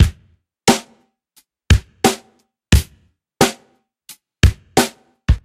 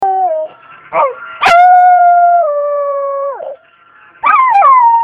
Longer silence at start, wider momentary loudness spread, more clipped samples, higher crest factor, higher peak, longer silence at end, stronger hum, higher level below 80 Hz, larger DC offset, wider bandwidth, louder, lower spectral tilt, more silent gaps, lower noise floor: about the same, 0 s vs 0 s; second, 10 LU vs 14 LU; neither; first, 18 dB vs 10 dB; about the same, 0 dBFS vs 0 dBFS; about the same, 0.05 s vs 0 s; neither; first, -24 dBFS vs -54 dBFS; neither; first, 16 kHz vs 9.2 kHz; second, -18 LUFS vs -9 LUFS; first, -4.5 dB/octave vs -2.5 dB/octave; neither; first, -58 dBFS vs -44 dBFS